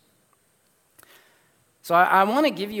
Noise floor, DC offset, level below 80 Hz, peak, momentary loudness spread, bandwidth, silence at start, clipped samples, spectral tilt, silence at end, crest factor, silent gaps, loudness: -65 dBFS; under 0.1%; -72 dBFS; -4 dBFS; 8 LU; 18 kHz; 1.85 s; under 0.1%; -5 dB/octave; 0 s; 20 dB; none; -20 LUFS